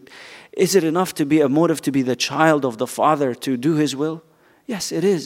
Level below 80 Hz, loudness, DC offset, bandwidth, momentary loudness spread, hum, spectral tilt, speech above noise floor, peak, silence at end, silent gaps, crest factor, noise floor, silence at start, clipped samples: -66 dBFS; -19 LUFS; under 0.1%; 16 kHz; 12 LU; none; -5 dB/octave; 23 dB; 0 dBFS; 0 s; none; 20 dB; -42 dBFS; 0.1 s; under 0.1%